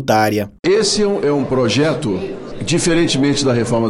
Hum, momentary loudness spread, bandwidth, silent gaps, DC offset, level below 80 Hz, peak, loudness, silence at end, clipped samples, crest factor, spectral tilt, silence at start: none; 7 LU; 15.5 kHz; 0.59-0.63 s; under 0.1%; -40 dBFS; -2 dBFS; -16 LUFS; 0 s; under 0.1%; 12 dB; -4.5 dB/octave; 0 s